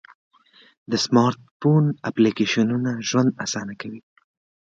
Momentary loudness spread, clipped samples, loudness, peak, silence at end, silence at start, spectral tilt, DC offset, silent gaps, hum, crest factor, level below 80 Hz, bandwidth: 13 LU; under 0.1%; -21 LUFS; -4 dBFS; 0.7 s; 0.9 s; -5.5 dB/octave; under 0.1%; 1.51-1.60 s; none; 18 dB; -64 dBFS; 7.8 kHz